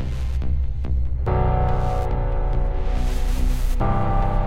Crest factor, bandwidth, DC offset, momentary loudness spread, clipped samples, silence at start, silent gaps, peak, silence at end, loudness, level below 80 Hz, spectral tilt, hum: 12 dB; 14 kHz; under 0.1%; 5 LU; under 0.1%; 0 s; none; -8 dBFS; 0 s; -24 LUFS; -22 dBFS; -7.5 dB/octave; none